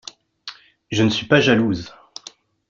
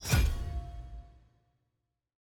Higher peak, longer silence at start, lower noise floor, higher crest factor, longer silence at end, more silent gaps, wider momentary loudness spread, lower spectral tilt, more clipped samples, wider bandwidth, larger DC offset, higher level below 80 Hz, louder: first, -2 dBFS vs -14 dBFS; first, 0.45 s vs 0 s; second, -45 dBFS vs -84 dBFS; about the same, 20 dB vs 20 dB; second, 0.8 s vs 1.2 s; neither; about the same, 22 LU vs 21 LU; about the same, -5.5 dB/octave vs -4.5 dB/octave; neither; second, 7.6 kHz vs over 20 kHz; neither; second, -54 dBFS vs -38 dBFS; first, -18 LUFS vs -34 LUFS